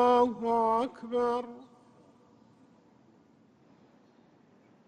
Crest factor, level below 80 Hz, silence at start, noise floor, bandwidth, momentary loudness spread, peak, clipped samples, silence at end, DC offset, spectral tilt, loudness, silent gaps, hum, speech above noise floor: 20 dB; -70 dBFS; 0 s; -62 dBFS; 9.4 kHz; 15 LU; -12 dBFS; under 0.1%; 3.25 s; under 0.1%; -6 dB/octave; -29 LUFS; none; none; 35 dB